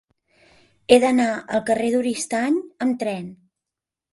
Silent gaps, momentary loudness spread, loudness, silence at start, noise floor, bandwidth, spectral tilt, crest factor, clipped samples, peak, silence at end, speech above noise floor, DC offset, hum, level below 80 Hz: none; 13 LU; -21 LUFS; 0.9 s; -87 dBFS; 11.5 kHz; -4 dB/octave; 20 dB; under 0.1%; -2 dBFS; 0.8 s; 67 dB; under 0.1%; none; -60 dBFS